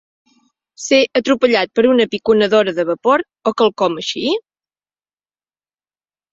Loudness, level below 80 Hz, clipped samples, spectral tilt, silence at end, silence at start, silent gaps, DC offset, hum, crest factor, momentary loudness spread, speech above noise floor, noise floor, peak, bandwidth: -15 LUFS; -60 dBFS; under 0.1%; -4 dB/octave; 1.95 s; 0.8 s; none; under 0.1%; 50 Hz at -55 dBFS; 16 dB; 7 LU; over 75 dB; under -90 dBFS; -2 dBFS; 7.8 kHz